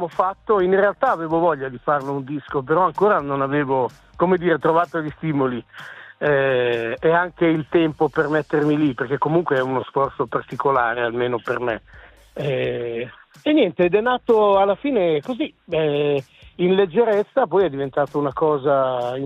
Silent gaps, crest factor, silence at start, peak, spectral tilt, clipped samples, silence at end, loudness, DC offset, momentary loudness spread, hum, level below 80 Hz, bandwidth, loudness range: none; 16 dB; 0 s; -4 dBFS; -8 dB/octave; under 0.1%; 0 s; -20 LUFS; under 0.1%; 9 LU; none; -54 dBFS; 7.8 kHz; 3 LU